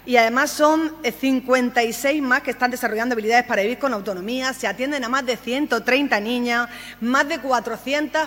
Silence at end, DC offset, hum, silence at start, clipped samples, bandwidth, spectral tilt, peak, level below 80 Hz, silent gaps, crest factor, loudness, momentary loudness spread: 0 s; under 0.1%; 50 Hz at -55 dBFS; 0.05 s; under 0.1%; 16.5 kHz; -3 dB/octave; 0 dBFS; -56 dBFS; none; 20 dB; -21 LUFS; 6 LU